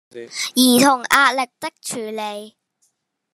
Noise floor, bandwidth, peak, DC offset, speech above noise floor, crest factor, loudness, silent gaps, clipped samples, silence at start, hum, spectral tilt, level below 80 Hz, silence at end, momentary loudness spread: -68 dBFS; 14 kHz; 0 dBFS; under 0.1%; 50 dB; 20 dB; -17 LUFS; none; under 0.1%; 0.15 s; none; -2 dB/octave; -62 dBFS; 0.85 s; 16 LU